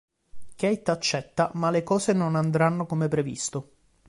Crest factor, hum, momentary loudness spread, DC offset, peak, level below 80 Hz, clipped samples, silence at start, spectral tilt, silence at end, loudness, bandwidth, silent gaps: 16 dB; none; 6 LU; under 0.1%; -10 dBFS; -60 dBFS; under 0.1%; 0.35 s; -5.5 dB/octave; 0.45 s; -26 LUFS; 11.5 kHz; none